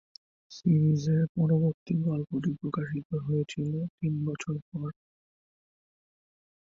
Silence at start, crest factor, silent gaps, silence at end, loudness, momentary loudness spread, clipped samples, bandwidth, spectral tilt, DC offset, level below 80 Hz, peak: 0.5 s; 16 dB; 1.29-1.35 s, 1.74-1.86 s, 3.05-3.10 s, 3.90-3.98 s, 4.62-4.72 s; 1.75 s; -29 LUFS; 10 LU; under 0.1%; 7.6 kHz; -8.5 dB/octave; under 0.1%; -64 dBFS; -14 dBFS